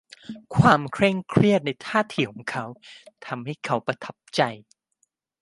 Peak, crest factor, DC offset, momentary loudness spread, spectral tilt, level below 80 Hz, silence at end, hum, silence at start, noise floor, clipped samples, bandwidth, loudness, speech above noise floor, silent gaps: -2 dBFS; 22 dB; under 0.1%; 21 LU; -6.5 dB/octave; -56 dBFS; 0.85 s; none; 0.3 s; -72 dBFS; under 0.1%; 11.5 kHz; -23 LUFS; 48 dB; none